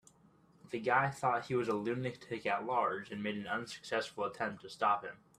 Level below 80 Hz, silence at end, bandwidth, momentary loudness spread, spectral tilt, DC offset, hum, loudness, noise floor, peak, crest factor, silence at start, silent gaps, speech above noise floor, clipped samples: -74 dBFS; 0.25 s; 14 kHz; 8 LU; -5.5 dB/octave; under 0.1%; none; -36 LUFS; -66 dBFS; -16 dBFS; 20 dB; 0.65 s; none; 30 dB; under 0.1%